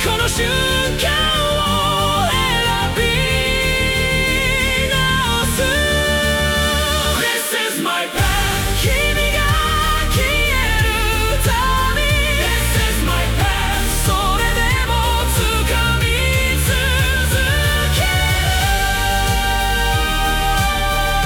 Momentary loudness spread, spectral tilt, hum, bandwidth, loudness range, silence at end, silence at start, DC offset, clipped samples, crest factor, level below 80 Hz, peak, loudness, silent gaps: 2 LU; -3.5 dB/octave; none; 18 kHz; 1 LU; 0 s; 0 s; under 0.1%; under 0.1%; 12 dB; -22 dBFS; -4 dBFS; -16 LUFS; none